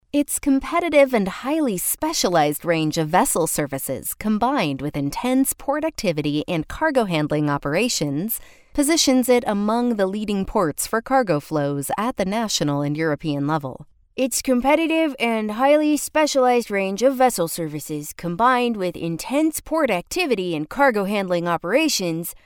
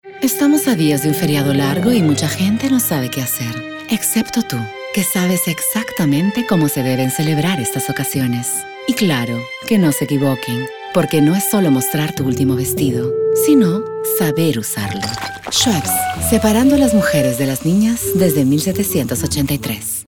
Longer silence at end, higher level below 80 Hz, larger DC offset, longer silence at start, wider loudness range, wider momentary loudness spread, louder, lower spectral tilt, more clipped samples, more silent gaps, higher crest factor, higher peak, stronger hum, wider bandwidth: about the same, 0.1 s vs 0.05 s; about the same, -48 dBFS vs -44 dBFS; second, under 0.1% vs 0.2%; about the same, 0.15 s vs 0.05 s; about the same, 3 LU vs 3 LU; about the same, 8 LU vs 7 LU; second, -21 LUFS vs -16 LUFS; about the same, -4 dB/octave vs -5 dB/octave; neither; neither; about the same, 18 dB vs 16 dB; second, -4 dBFS vs 0 dBFS; neither; about the same, 19 kHz vs over 20 kHz